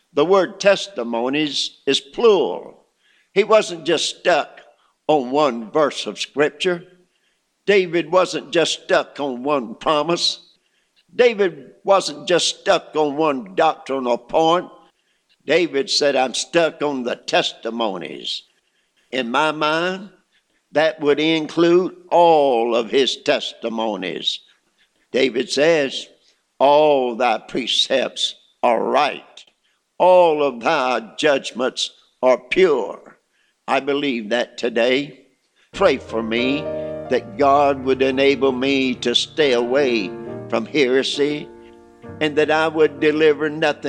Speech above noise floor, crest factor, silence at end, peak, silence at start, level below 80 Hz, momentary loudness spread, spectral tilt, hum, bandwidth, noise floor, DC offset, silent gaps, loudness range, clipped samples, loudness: 48 dB; 16 dB; 0 s; -4 dBFS; 0.15 s; -60 dBFS; 9 LU; -3.5 dB/octave; none; 10.5 kHz; -67 dBFS; under 0.1%; none; 4 LU; under 0.1%; -19 LUFS